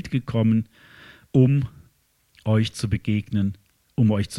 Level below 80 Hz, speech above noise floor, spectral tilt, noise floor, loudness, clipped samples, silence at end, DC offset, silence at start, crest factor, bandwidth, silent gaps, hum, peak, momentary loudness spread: -48 dBFS; 42 dB; -7.5 dB/octave; -63 dBFS; -23 LUFS; under 0.1%; 0 s; under 0.1%; 0.05 s; 18 dB; 12 kHz; none; none; -6 dBFS; 13 LU